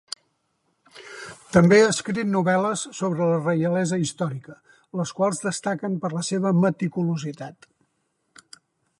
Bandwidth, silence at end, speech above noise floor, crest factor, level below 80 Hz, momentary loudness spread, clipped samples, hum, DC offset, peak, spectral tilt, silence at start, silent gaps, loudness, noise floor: 11.5 kHz; 1.5 s; 51 dB; 20 dB; -60 dBFS; 20 LU; under 0.1%; none; under 0.1%; -4 dBFS; -5.5 dB/octave; 0.95 s; none; -23 LUFS; -73 dBFS